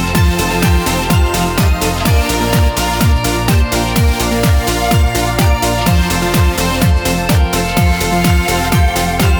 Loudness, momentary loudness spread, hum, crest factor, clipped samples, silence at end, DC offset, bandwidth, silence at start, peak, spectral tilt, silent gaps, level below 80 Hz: -13 LUFS; 1 LU; none; 12 dB; under 0.1%; 0 s; under 0.1%; over 20 kHz; 0 s; 0 dBFS; -5 dB/octave; none; -18 dBFS